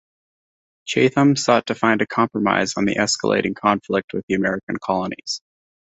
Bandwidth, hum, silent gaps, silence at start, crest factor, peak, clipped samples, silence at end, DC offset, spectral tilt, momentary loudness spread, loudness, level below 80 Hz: 8.4 kHz; none; 4.04-4.08 s, 4.23-4.28 s, 4.63-4.67 s; 0.85 s; 18 dB; -2 dBFS; under 0.1%; 0.45 s; under 0.1%; -4.5 dB/octave; 10 LU; -20 LUFS; -56 dBFS